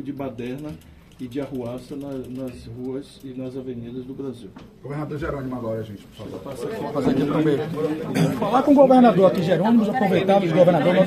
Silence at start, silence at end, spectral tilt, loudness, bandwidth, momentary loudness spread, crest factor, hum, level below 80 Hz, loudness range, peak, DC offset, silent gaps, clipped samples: 0 s; 0 s; -7.5 dB/octave; -21 LUFS; 14.5 kHz; 19 LU; 18 dB; none; -52 dBFS; 15 LU; -2 dBFS; under 0.1%; none; under 0.1%